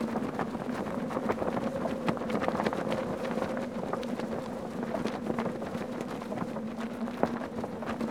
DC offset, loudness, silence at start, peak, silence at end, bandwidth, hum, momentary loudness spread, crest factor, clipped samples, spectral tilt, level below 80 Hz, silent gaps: under 0.1%; -34 LUFS; 0 s; -8 dBFS; 0 s; 16.5 kHz; none; 5 LU; 26 dB; under 0.1%; -6.5 dB/octave; -60 dBFS; none